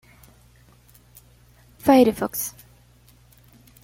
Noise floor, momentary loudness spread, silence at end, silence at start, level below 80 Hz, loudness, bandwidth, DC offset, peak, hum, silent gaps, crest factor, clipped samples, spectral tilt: -54 dBFS; 13 LU; 1.35 s; 1.85 s; -54 dBFS; -20 LUFS; 17 kHz; under 0.1%; -4 dBFS; 60 Hz at -55 dBFS; none; 22 dB; under 0.1%; -4.5 dB/octave